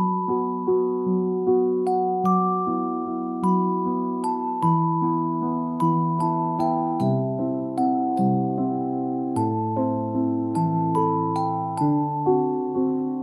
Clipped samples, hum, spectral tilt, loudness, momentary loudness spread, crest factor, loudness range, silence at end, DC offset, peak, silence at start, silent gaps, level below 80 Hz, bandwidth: under 0.1%; none; -10 dB/octave; -23 LUFS; 4 LU; 14 dB; 1 LU; 0 s; under 0.1%; -8 dBFS; 0 s; none; -66 dBFS; 11.5 kHz